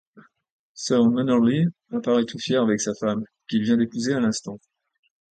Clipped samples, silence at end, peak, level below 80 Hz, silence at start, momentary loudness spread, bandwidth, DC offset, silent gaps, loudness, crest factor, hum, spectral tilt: under 0.1%; 0.75 s; -8 dBFS; -64 dBFS; 0.75 s; 11 LU; 9.2 kHz; under 0.1%; none; -23 LUFS; 14 dB; none; -5.5 dB/octave